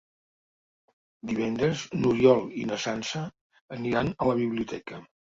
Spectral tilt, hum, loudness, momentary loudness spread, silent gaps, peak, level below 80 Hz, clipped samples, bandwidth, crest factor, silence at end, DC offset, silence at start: -6 dB/octave; none; -27 LUFS; 19 LU; 3.41-3.50 s, 3.61-3.68 s; -6 dBFS; -58 dBFS; under 0.1%; 7.8 kHz; 22 dB; 0.35 s; under 0.1%; 1.25 s